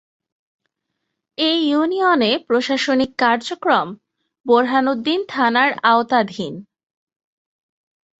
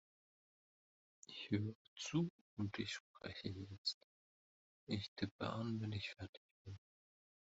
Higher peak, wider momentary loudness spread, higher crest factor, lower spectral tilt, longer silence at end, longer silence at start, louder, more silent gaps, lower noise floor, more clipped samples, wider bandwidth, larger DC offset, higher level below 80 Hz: first, -2 dBFS vs -26 dBFS; second, 12 LU vs 16 LU; about the same, 18 dB vs 22 dB; about the same, -4.5 dB/octave vs -5 dB/octave; first, 1.6 s vs 0.8 s; about the same, 1.4 s vs 1.3 s; first, -17 LUFS vs -46 LUFS; second, 4.40-4.44 s vs 1.75-1.96 s, 2.30-2.57 s, 3.00-3.14 s, 3.78-3.85 s, 3.94-4.87 s, 5.08-5.16 s, 5.31-5.39 s, 6.29-6.65 s; second, -77 dBFS vs under -90 dBFS; neither; about the same, 8.2 kHz vs 7.6 kHz; neither; first, -64 dBFS vs -78 dBFS